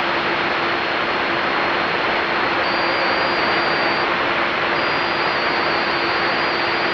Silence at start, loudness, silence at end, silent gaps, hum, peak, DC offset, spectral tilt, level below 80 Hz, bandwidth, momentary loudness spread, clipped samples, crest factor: 0 s; -18 LUFS; 0 s; none; none; -6 dBFS; under 0.1%; -4.5 dB/octave; -50 dBFS; 8.4 kHz; 1 LU; under 0.1%; 14 dB